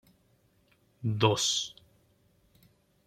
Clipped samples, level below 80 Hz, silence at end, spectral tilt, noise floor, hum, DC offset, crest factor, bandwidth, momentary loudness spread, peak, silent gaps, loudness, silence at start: under 0.1%; -68 dBFS; 1.35 s; -3.5 dB/octave; -68 dBFS; none; under 0.1%; 26 dB; 15 kHz; 12 LU; -8 dBFS; none; -29 LUFS; 1 s